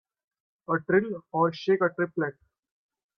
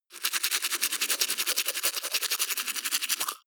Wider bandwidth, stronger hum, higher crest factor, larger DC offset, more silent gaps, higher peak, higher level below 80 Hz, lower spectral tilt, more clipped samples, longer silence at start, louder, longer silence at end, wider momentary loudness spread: second, 6.4 kHz vs over 20 kHz; neither; second, 18 dB vs 24 dB; neither; neither; second, -10 dBFS vs -6 dBFS; first, -70 dBFS vs under -90 dBFS; first, -8 dB/octave vs 4 dB/octave; neither; first, 0.7 s vs 0.1 s; about the same, -27 LUFS vs -27 LUFS; first, 0.85 s vs 0.1 s; first, 8 LU vs 3 LU